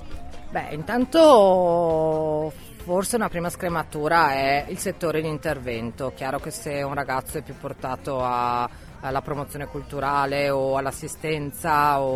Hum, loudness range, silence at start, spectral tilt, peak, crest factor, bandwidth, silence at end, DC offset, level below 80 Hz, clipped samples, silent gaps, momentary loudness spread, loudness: none; 8 LU; 0 s; -5 dB/octave; -2 dBFS; 20 dB; 15.5 kHz; 0 s; under 0.1%; -46 dBFS; under 0.1%; none; 13 LU; -23 LUFS